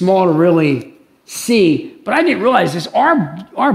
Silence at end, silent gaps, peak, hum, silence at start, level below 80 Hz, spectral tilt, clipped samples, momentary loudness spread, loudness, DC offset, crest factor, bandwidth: 0 s; none; 0 dBFS; none; 0 s; -60 dBFS; -5.5 dB/octave; under 0.1%; 10 LU; -14 LUFS; under 0.1%; 14 dB; 15.5 kHz